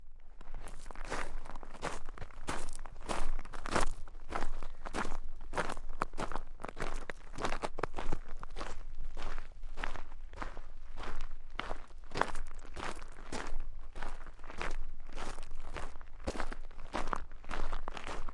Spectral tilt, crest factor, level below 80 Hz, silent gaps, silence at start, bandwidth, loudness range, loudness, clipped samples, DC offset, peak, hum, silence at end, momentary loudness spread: -4 dB/octave; 24 dB; -38 dBFS; none; 0 s; 11 kHz; 5 LU; -43 LUFS; under 0.1%; under 0.1%; -8 dBFS; none; 0 s; 11 LU